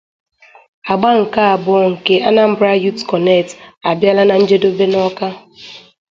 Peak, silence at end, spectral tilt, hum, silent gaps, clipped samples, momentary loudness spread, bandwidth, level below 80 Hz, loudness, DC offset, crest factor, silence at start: 0 dBFS; 0.3 s; -6 dB/octave; none; 3.77-3.81 s; under 0.1%; 15 LU; 7.6 kHz; -56 dBFS; -13 LUFS; under 0.1%; 14 dB; 0.85 s